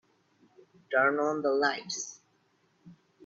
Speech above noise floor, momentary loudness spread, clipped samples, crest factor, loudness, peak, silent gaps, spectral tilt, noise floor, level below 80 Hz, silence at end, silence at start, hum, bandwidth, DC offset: 42 dB; 10 LU; under 0.1%; 20 dB; -29 LUFS; -12 dBFS; none; -2.5 dB/octave; -70 dBFS; -82 dBFS; 0.35 s; 0.9 s; none; 8 kHz; under 0.1%